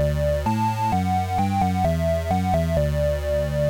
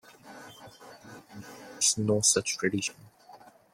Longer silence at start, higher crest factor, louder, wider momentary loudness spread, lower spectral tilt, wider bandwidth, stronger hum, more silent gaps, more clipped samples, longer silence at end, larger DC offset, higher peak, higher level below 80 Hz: second, 0 s vs 0.25 s; second, 12 dB vs 22 dB; first, -22 LUFS vs -26 LUFS; second, 2 LU vs 26 LU; first, -7 dB/octave vs -2.5 dB/octave; about the same, 17 kHz vs 16.5 kHz; neither; neither; neither; second, 0 s vs 0.35 s; neither; about the same, -8 dBFS vs -10 dBFS; first, -32 dBFS vs -68 dBFS